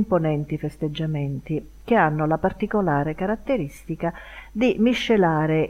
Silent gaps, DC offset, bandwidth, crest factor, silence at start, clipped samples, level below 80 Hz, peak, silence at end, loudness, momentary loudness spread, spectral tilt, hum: none; under 0.1%; 14.5 kHz; 16 dB; 0 s; under 0.1%; -44 dBFS; -6 dBFS; 0 s; -23 LUFS; 10 LU; -7.5 dB/octave; none